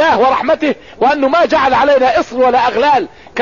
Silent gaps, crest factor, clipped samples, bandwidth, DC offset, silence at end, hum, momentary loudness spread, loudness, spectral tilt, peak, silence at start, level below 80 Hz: none; 8 dB; under 0.1%; 7.4 kHz; 0.5%; 0 s; none; 5 LU; -12 LUFS; -4.5 dB/octave; -2 dBFS; 0 s; -44 dBFS